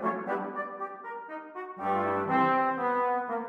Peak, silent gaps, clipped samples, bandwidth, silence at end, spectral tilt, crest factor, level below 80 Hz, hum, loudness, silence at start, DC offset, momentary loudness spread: -16 dBFS; none; under 0.1%; 6 kHz; 0 s; -8 dB/octave; 16 dB; -78 dBFS; none; -29 LUFS; 0 s; under 0.1%; 15 LU